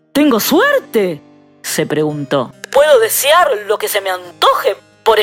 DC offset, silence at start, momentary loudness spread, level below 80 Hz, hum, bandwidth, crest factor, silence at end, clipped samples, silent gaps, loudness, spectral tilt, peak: under 0.1%; 0.15 s; 9 LU; -54 dBFS; none; 16.5 kHz; 14 dB; 0 s; under 0.1%; none; -13 LUFS; -3 dB/octave; 0 dBFS